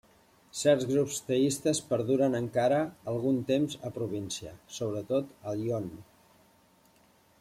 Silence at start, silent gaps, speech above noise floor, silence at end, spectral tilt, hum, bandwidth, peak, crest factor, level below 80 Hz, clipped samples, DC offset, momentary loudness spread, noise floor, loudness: 0.55 s; none; 34 dB; 1.4 s; -5 dB/octave; none; 16 kHz; -12 dBFS; 18 dB; -66 dBFS; under 0.1%; under 0.1%; 10 LU; -63 dBFS; -30 LUFS